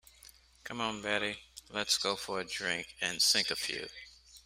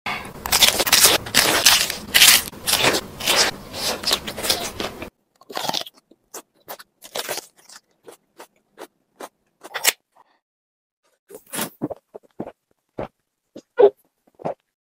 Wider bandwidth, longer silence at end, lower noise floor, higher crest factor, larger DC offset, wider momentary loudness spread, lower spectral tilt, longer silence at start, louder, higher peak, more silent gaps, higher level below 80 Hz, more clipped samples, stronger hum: about the same, 16 kHz vs 16.5 kHz; second, 0.05 s vs 0.3 s; about the same, -59 dBFS vs -58 dBFS; about the same, 22 dB vs 22 dB; neither; second, 19 LU vs 25 LU; about the same, -1 dB/octave vs -0.5 dB/octave; first, 0.25 s vs 0.05 s; second, -32 LUFS vs -17 LUFS; second, -14 dBFS vs 0 dBFS; second, none vs 10.42-11.03 s, 11.19-11.27 s; second, -66 dBFS vs -50 dBFS; neither; neither